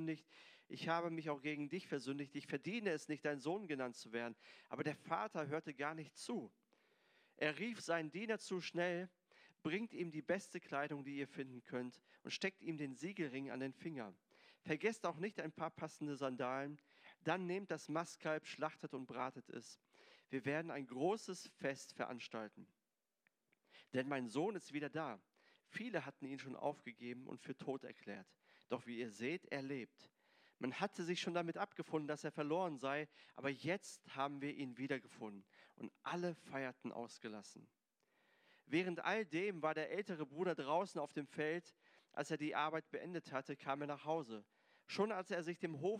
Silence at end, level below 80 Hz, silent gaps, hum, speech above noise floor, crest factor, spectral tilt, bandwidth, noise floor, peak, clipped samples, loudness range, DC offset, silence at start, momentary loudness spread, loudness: 0 s; under -90 dBFS; none; none; over 46 dB; 22 dB; -5 dB/octave; 14.5 kHz; under -90 dBFS; -24 dBFS; under 0.1%; 5 LU; under 0.1%; 0 s; 11 LU; -45 LUFS